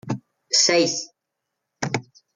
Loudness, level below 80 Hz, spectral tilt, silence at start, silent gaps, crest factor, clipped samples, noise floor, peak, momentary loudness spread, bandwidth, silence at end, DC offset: -20 LUFS; -68 dBFS; -2.5 dB/octave; 0.05 s; none; 18 dB; under 0.1%; -81 dBFS; -6 dBFS; 16 LU; 11 kHz; 0.35 s; under 0.1%